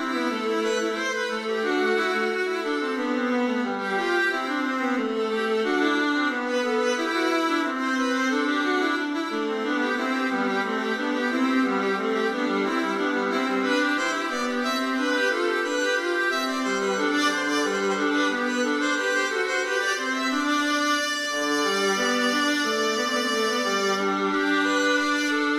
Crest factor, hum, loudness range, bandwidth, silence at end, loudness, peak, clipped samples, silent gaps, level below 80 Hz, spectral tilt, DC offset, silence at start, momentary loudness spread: 14 dB; none; 2 LU; 15 kHz; 0 s; -24 LUFS; -10 dBFS; under 0.1%; none; -74 dBFS; -2.5 dB/octave; under 0.1%; 0 s; 4 LU